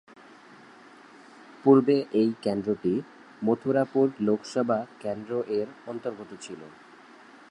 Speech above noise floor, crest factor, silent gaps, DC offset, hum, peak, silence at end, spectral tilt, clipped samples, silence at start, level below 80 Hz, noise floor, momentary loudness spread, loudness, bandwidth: 25 dB; 20 dB; none; under 0.1%; none; -8 dBFS; 0.85 s; -7 dB/octave; under 0.1%; 1.65 s; -70 dBFS; -51 dBFS; 20 LU; -26 LUFS; 10.5 kHz